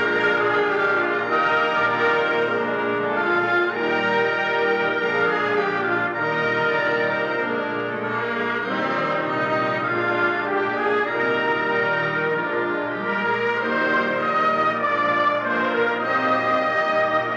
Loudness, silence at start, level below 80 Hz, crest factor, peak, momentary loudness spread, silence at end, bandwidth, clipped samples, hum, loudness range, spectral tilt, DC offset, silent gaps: -21 LUFS; 0 s; -68 dBFS; 12 dB; -10 dBFS; 4 LU; 0 s; 8 kHz; under 0.1%; none; 2 LU; -6 dB/octave; under 0.1%; none